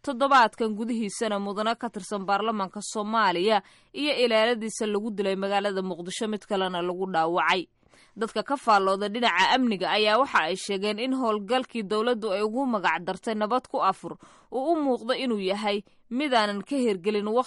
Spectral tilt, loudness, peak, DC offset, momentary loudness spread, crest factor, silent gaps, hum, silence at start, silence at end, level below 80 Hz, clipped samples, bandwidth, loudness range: -4 dB/octave; -26 LUFS; -10 dBFS; under 0.1%; 9 LU; 16 dB; none; none; 0.05 s; 0 s; -68 dBFS; under 0.1%; 11.5 kHz; 4 LU